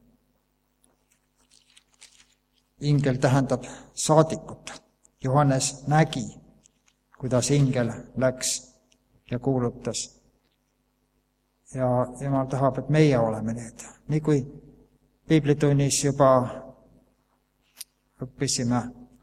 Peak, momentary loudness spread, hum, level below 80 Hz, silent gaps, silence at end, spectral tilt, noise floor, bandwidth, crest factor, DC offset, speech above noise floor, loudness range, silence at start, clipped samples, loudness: -2 dBFS; 20 LU; 50 Hz at -50 dBFS; -54 dBFS; none; 0.2 s; -5.5 dB/octave; -71 dBFS; 15 kHz; 24 dB; under 0.1%; 47 dB; 6 LU; 2 s; under 0.1%; -24 LUFS